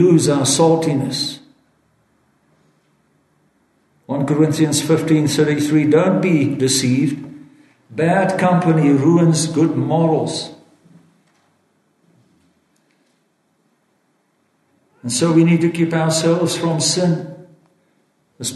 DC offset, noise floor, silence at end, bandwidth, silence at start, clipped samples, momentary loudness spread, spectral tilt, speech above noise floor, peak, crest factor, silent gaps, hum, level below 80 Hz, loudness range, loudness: under 0.1%; -64 dBFS; 0 s; 12.5 kHz; 0 s; under 0.1%; 11 LU; -5.5 dB/octave; 48 dB; -2 dBFS; 16 dB; none; none; -62 dBFS; 9 LU; -16 LUFS